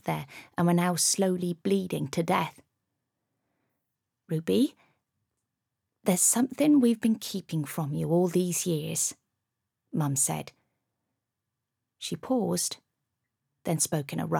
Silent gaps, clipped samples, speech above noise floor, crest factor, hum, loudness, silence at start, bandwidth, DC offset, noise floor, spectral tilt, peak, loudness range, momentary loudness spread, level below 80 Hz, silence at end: none; under 0.1%; 58 dB; 18 dB; none; -27 LUFS; 0.05 s; 19 kHz; under 0.1%; -85 dBFS; -4.5 dB/octave; -12 dBFS; 8 LU; 13 LU; -72 dBFS; 0 s